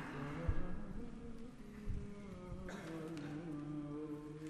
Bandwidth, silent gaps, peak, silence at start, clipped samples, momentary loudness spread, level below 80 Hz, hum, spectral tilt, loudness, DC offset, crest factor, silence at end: 11.5 kHz; none; -24 dBFS; 0 s; under 0.1%; 9 LU; -50 dBFS; none; -7.5 dB/octave; -47 LUFS; under 0.1%; 20 dB; 0 s